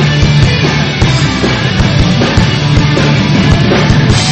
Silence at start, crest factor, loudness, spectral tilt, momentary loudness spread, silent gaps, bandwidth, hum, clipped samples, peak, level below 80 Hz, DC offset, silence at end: 0 s; 8 dB; -9 LUFS; -5.5 dB/octave; 2 LU; none; 8.6 kHz; none; 0.2%; 0 dBFS; -20 dBFS; under 0.1%; 0 s